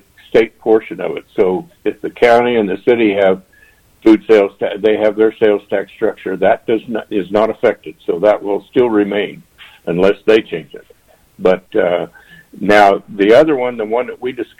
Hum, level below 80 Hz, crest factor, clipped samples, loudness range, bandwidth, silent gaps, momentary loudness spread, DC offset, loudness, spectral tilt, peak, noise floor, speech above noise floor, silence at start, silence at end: none; -50 dBFS; 14 dB; under 0.1%; 3 LU; 11.5 kHz; none; 12 LU; under 0.1%; -14 LUFS; -6.5 dB/octave; 0 dBFS; -49 dBFS; 35 dB; 0.35 s; 0.15 s